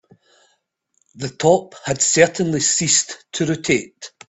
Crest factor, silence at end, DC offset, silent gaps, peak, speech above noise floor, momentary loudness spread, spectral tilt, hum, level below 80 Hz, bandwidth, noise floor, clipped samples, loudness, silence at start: 20 dB; 0.2 s; under 0.1%; none; 0 dBFS; 49 dB; 13 LU; -3 dB/octave; none; -56 dBFS; 8.4 kHz; -68 dBFS; under 0.1%; -17 LUFS; 1.15 s